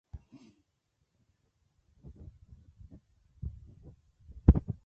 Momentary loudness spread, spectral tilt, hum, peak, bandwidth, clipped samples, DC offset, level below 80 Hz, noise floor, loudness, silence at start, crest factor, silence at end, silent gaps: 28 LU; -11.5 dB/octave; none; -4 dBFS; 2.9 kHz; under 0.1%; under 0.1%; -38 dBFS; -79 dBFS; -30 LUFS; 0.15 s; 30 dB; 0.15 s; none